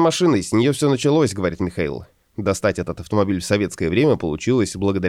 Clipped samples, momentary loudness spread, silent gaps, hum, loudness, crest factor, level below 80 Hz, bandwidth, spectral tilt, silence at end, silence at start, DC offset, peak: under 0.1%; 9 LU; none; none; -20 LUFS; 14 dB; -46 dBFS; 15 kHz; -5.5 dB/octave; 0 s; 0 s; under 0.1%; -4 dBFS